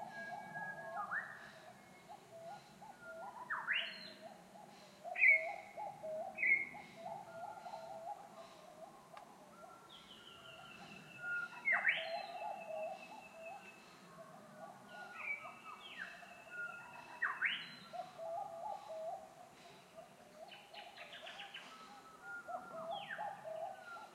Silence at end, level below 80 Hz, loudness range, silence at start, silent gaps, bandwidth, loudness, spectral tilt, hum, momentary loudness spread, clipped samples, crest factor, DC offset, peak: 0 s; -88 dBFS; 16 LU; 0 s; none; 16 kHz; -41 LUFS; -2.5 dB/octave; none; 22 LU; under 0.1%; 26 dB; under 0.1%; -18 dBFS